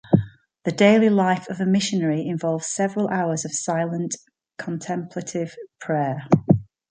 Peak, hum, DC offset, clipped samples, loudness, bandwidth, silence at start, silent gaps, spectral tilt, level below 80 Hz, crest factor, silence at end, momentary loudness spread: -2 dBFS; none; under 0.1%; under 0.1%; -22 LUFS; 9.6 kHz; 0.05 s; none; -5.5 dB/octave; -56 dBFS; 20 dB; 0.25 s; 13 LU